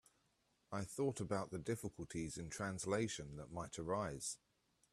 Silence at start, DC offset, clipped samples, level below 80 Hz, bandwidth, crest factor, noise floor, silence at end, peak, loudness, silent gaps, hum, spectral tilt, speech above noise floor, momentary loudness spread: 0.7 s; under 0.1%; under 0.1%; -68 dBFS; 14.5 kHz; 20 dB; -80 dBFS; 0.55 s; -24 dBFS; -44 LUFS; none; none; -5 dB/octave; 37 dB; 8 LU